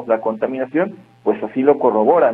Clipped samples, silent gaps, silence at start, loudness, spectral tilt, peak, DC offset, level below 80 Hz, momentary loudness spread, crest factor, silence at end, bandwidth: under 0.1%; none; 0 s; -18 LUFS; -9.5 dB/octave; 0 dBFS; under 0.1%; -64 dBFS; 8 LU; 16 dB; 0 s; 3.9 kHz